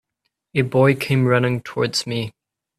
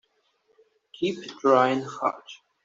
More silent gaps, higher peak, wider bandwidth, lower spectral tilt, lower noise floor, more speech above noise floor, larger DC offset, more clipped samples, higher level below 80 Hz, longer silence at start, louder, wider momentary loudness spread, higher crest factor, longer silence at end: neither; about the same, -4 dBFS vs -6 dBFS; first, 14.5 kHz vs 7.8 kHz; about the same, -6 dB/octave vs -5.5 dB/octave; first, -76 dBFS vs -69 dBFS; first, 57 dB vs 44 dB; neither; neither; first, -56 dBFS vs -74 dBFS; second, 0.55 s vs 1 s; first, -20 LUFS vs -25 LUFS; second, 10 LU vs 15 LU; about the same, 18 dB vs 22 dB; first, 0.5 s vs 0.3 s